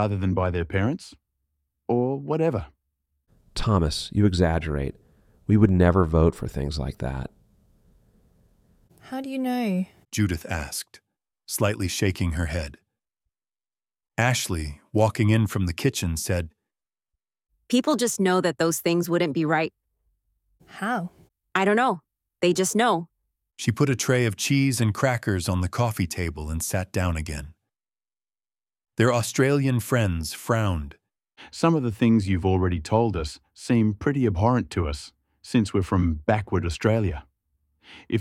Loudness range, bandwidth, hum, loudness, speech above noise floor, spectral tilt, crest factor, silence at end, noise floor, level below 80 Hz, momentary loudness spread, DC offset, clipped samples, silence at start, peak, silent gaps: 6 LU; 16 kHz; none; -24 LUFS; over 67 dB; -5.5 dB/octave; 20 dB; 0 s; under -90 dBFS; -40 dBFS; 12 LU; under 0.1%; under 0.1%; 0 s; -4 dBFS; none